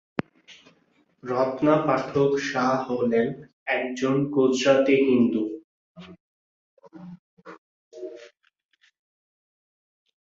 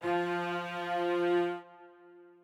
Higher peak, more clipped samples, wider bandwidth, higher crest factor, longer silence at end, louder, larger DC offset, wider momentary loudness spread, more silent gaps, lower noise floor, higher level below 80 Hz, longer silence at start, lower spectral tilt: first, -6 dBFS vs -20 dBFS; neither; second, 7.8 kHz vs 10.5 kHz; first, 20 dB vs 14 dB; first, 1.95 s vs 0.15 s; first, -23 LUFS vs -32 LUFS; neither; first, 22 LU vs 7 LU; first, 3.53-3.66 s, 5.64-5.95 s, 6.20-6.77 s, 7.19-7.37 s, 7.58-7.91 s vs none; first, -65 dBFS vs -56 dBFS; first, -66 dBFS vs -88 dBFS; first, 0.2 s vs 0 s; about the same, -6 dB/octave vs -6 dB/octave